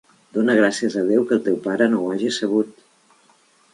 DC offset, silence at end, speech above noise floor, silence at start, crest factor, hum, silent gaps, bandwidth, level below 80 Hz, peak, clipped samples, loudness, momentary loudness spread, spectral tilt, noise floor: under 0.1%; 1 s; 38 dB; 0.35 s; 18 dB; none; none; 11.5 kHz; -70 dBFS; -4 dBFS; under 0.1%; -20 LUFS; 6 LU; -5 dB/octave; -57 dBFS